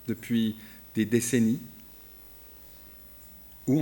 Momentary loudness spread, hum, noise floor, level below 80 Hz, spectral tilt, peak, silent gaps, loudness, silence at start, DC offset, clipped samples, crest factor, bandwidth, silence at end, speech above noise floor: 21 LU; none; -49 dBFS; -60 dBFS; -5.5 dB/octave; -10 dBFS; none; -28 LUFS; 0 s; under 0.1%; under 0.1%; 20 dB; 18 kHz; 0 s; 22 dB